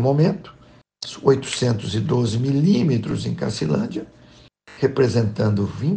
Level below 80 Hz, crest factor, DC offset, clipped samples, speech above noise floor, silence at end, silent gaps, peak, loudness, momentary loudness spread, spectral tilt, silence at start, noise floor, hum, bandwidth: -52 dBFS; 18 dB; under 0.1%; under 0.1%; 30 dB; 0 s; none; -4 dBFS; -21 LUFS; 11 LU; -7 dB/octave; 0 s; -49 dBFS; none; 9.4 kHz